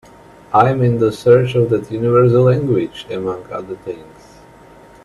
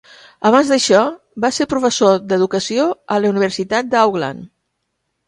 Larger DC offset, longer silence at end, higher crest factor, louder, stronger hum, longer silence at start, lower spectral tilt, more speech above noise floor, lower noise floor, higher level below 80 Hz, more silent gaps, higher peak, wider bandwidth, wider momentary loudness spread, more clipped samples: neither; first, 1 s vs 0.8 s; about the same, 16 dB vs 16 dB; about the same, -15 LUFS vs -16 LUFS; neither; about the same, 0.5 s vs 0.4 s; first, -8.5 dB/octave vs -4 dB/octave; second, 28 dB vs 57 dB; second, -42 dBFS vs -72 dBFS; first, -48 dBFS vs -56 dBFS; neither; about the same, 0 dBFS vs 0 dBFS; about the same, 12 kHz vs 11.5 kHz; first, 16 LU vs 8 LU; neither